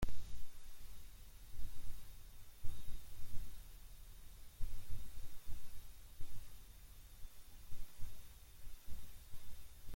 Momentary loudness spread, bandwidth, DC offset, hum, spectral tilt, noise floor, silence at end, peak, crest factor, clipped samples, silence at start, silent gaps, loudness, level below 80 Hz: 7 LU; 16.5 kHz; under 0.1%; none; -4.5 dB/octave; -56 dBFS; 0 s; -24 dBFS; 14 dB; under 0.1%; 0 s; none; -58 LUFS; -50 dBFS